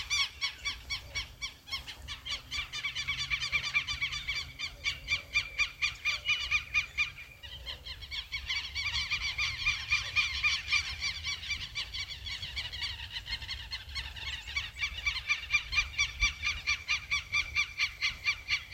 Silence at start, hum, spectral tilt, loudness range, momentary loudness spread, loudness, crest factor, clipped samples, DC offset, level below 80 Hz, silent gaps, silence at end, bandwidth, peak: 0 s; none; 0 dB/octave; 6 LU; 10 LU; -32 LUFS; 20 dB; under 0.1%; under 0.1%; -48 dBFS; none; 0 s; 16.5 kHz; -16 dBFS